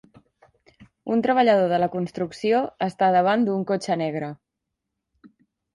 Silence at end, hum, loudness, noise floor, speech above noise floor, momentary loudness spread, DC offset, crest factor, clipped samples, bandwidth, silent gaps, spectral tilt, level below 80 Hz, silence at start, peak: 0.45 s; none; -22 LUFS; -82 dBFS; 60 dB; 10 LU; under 0.1%; 18 dB; under 0.1%; 11.5 kHz; none; -6.5 dB/octave; -66 dBFS; 0.8 s; -6 dBFS